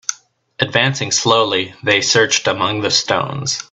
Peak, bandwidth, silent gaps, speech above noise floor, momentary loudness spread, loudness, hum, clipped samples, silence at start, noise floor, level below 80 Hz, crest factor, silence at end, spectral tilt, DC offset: 0 dBFS; 8.4 kHz; none; 23 dB; 7 LU; -15 LUFS; none; under 0.1%; 0.1 s; -39 dBFS; -56 dBFS; 18 dB; 0.1 s; -2.5 dB/octave; under 0.1%